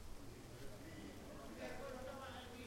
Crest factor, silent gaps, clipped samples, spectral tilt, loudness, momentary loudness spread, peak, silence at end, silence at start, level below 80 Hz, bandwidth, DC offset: 14 dB; none; under 0.1%; -4.5 dB/octave; -53 LUFS; 6 LU; -38 dBFS; 0 s; 0 s; -60 dBFS; 16 kHz; under 0.1%